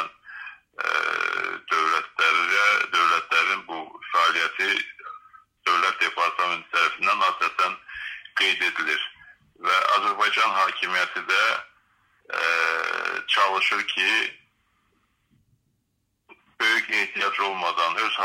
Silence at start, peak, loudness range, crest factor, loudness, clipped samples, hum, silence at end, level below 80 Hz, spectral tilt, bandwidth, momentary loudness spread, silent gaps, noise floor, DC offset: 0 s; -6 dBFS; 5 LU; 20 dB; -22 LUFS; under 0.1%; none; 0 s; -74 dBFS; 0 dB/octave; 16 kHz; 11 LU; none; -74 dBFS; under 0.1%